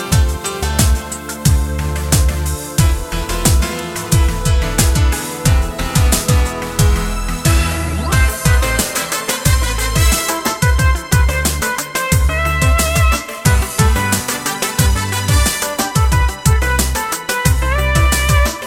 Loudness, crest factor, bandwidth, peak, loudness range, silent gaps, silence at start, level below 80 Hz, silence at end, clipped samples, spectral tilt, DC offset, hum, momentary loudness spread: -15 LUFS; 14 dB; 17.5 kHz; 0 dBFS; 1 LU; none; 0 s; -18 dBFS; 0 s; under 0.1%; -4 dB/octave; under 0.1%; none; 5 LU